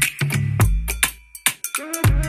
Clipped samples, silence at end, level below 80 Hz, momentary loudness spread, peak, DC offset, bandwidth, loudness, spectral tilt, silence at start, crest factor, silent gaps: under 0.1%; 0 s; -26 dBFS; 3 LU; 0 dBFS; under 0.1%; 16 kHz; -21 LUFS; -3.5 dB/octave; 0 s; 20 dB; none